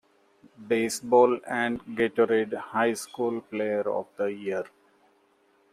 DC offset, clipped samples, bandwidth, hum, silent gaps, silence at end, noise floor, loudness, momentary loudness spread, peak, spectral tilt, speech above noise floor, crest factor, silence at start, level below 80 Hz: under 0.1%; under 0.1%; 15 kHz; none; none; 1.05 s; -65 dBFS; -27 LUFS; 10 LU; -8 dBFS; -4.5 dB/octave; 39 dB; 20 dB; 0.6 s; -70 dBFS